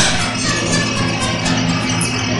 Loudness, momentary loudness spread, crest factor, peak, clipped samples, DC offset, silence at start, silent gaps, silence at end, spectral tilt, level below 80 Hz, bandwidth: -16 LUFS; 2 LU; 16 dB; 0 dBFS; under 0.1%; under 0.1%; 0 s; none; 0 s; -3.5 dB/octave; -36 dBFS; 12 kHz